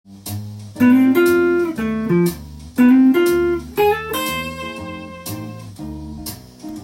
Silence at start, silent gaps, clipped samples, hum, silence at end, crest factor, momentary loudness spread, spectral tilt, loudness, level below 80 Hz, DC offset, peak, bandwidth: 0.1 s; none; under 0.1%; none; 0 s; 14 dB; 19 LU; -6 dB/octave; -16 LUFS; -44 dBFS; under 0.1%; -4 dBFS; 17 kHz